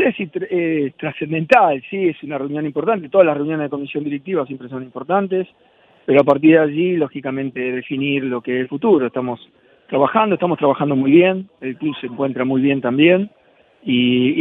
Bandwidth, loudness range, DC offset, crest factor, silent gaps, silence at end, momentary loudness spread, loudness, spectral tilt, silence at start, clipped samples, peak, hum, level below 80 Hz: 6 kHz; 3 LU; under 0.1%; 18 dB; none; 0 s; 12 LU; -18 LUFS; -8.5 dB/octave; 0 s; under 0.1%; 0 dBFS; none; -62 dBFS